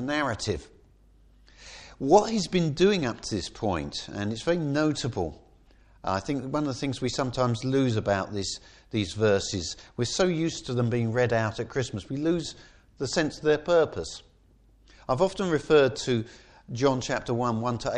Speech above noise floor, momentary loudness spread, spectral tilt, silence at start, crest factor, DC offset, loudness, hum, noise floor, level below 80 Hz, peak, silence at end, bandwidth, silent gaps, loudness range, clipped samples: 33 dB; 12 LU; -5.5 dB/octave; 0 s; 22 dB; under 0.1%; -27 LUFS; none; -59 dBFS; -52 dBFS; -6 dBFS; 0 s; 10.5 kHz; none; 3 LU; under 0.1%